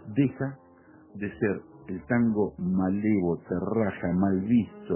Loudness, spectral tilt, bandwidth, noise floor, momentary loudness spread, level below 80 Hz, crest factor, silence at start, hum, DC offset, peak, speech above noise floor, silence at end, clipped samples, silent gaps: -27 LUFS; -9 dB/octave; 3.2 kHz; -54 dBFS; 12 LU; -52 dBFS; 16 dB; 0.05 s; none; under 0.1%; -12 dBFS; 27 dB; 0 s; under 0.1%; none